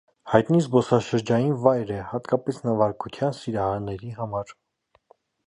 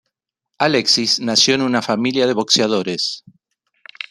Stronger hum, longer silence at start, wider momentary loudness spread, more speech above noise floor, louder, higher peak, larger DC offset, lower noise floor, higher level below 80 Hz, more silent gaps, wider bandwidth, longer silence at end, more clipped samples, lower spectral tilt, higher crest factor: neither; second, 0.25 s vs 0.6 s; about the same, 10 LU vs 9 LU; second, 43 dB vs 61 dB; second, -24 LUFS vs -16 LUFS; about the same, -2 dBFS vs 0 dBFS; neither; second, -67 dBFS vs -78 dBFS; first, -56 dBFS vs -64 dBFS; neither; second, 11 kHz vs 14 kHz; about the same, 0.95 s vs 0.9 s; neither; first, -7.5 dB/octave vs -3 dB/octave; about the same, 22 dB vs 18 dB